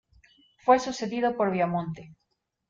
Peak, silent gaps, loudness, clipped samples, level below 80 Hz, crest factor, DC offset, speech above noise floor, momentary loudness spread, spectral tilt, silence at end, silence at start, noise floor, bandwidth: -8 dBFS; none; -26 LUFS; under 0.1%; -64 dBFS; 20 dB; under 0.1%; 35 dB; 11 LU; -6 dB/octave; 0.55 s; 0.65 s; -60 dBFS; 7.8 kHz